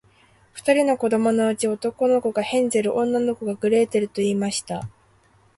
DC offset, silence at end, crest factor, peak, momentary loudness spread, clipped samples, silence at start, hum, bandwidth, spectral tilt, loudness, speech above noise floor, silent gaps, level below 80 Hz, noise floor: under 0.1%; 0.7 s; 16 dB; -6 dBFS; 8 LU; under 0.1%; 0.55 s; none; 11.5 kHz; -5 dB/octave; -22 LUFS; 37 dB; none; -62 dBFS; -58 dBFS